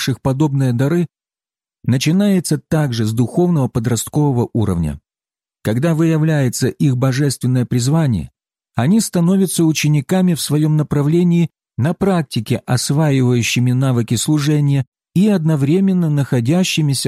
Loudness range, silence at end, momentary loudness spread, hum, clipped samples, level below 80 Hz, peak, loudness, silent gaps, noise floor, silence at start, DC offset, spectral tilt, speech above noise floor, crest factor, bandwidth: 2 LU; 0 s; 6 LU; none; under 0.1%; -44 dBFS; -4 dBFS; -16 LUFS; 14.87-14.92 s; under -90 dBFS; 0 s; under 0.1%; -6 dB/octave; over 75 dB; 12 dB; 15 kHz